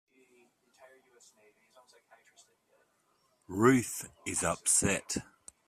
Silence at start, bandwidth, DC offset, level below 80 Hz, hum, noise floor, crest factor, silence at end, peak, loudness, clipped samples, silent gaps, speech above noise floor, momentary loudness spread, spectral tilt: 3.5 s; 15.5 kHz; under 0.1%; -64 dBFS; none; -73 dBFS; 24 dB; 0.45 s; -10 dBFS; -30 LUFS; under 0.1%; none; 41 dB; 13 LU; -3.5 dB/octave